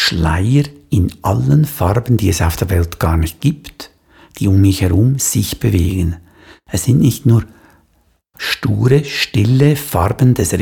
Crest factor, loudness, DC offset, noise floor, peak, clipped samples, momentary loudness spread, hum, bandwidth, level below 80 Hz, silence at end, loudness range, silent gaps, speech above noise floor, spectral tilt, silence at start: 14 dB; -15 LUFS; under 0.1%; -57 dBFS; 0 dBFS; under 0.1%; 8 LU; none; 19 kHz; -30 dBFS; 0 s; 2 LU; none; 44 dB; -5.5 dB/octave; 0 s